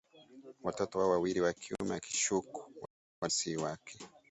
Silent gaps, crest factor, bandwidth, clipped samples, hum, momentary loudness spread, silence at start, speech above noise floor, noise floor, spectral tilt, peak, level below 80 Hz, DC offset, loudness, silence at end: 2.90-3.22 s; 18 dB; 8.2 kHz; under 0.1%; none; 20 LU; 0.15 s; 21 dB; -56 dBFS; -3.5 dB/octave; -18 dBFS; -68 dBFS; under 0.1%; -35 LUFS; 0.2 s